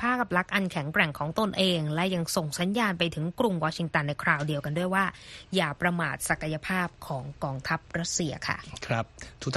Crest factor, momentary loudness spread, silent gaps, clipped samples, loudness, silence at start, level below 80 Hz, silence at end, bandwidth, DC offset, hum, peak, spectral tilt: 22 dB; 7 LU; none; under 0.1%; -28 LUFS; 0 s; -54 dBFS; 0 s; 13 kHz; under 0.1%; none; -8 dBFS; -4.5 dB/octave